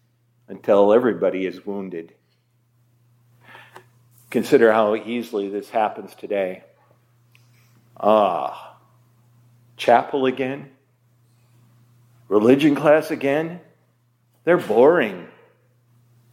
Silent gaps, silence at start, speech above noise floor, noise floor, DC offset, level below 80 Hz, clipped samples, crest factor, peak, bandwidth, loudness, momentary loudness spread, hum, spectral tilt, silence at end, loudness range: none; 0.5 s; 45 dB; -64 dBFS; under 0.1%; -74 dBFS; under 0.1%; 20 dB; -2 dBFS; 16 kHz; -20 LUFS; 16 LU; none; -6.5 dB/octave; 1.1 s; 6 LU